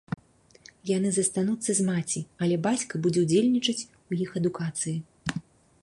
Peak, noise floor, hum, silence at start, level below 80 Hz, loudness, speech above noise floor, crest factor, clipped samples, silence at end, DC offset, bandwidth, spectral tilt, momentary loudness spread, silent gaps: -10 dBFS; -56 dBFS; none; 0.85 s; -62 dBFS; -27 LUFS; 30 dB; 18 dB; under 0.1%; 0.4 s; under 0.1%; 11.5 kHz; -4.5 dB/octave; 12 LU; none